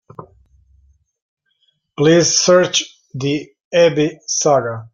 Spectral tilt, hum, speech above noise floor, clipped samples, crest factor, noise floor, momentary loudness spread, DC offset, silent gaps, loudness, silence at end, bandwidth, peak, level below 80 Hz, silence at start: -3.5 dB/octave; none; 50 dB; under 0.1%; 16 dB; -64 dBFS; 13 LU; under 0.1%; 1.22-1.37 s, 3.64-3.71 s; -15 LUFS; 0.05 s; 7.6 kHz; -2 dBFS; -56 dBFS; 0.2 s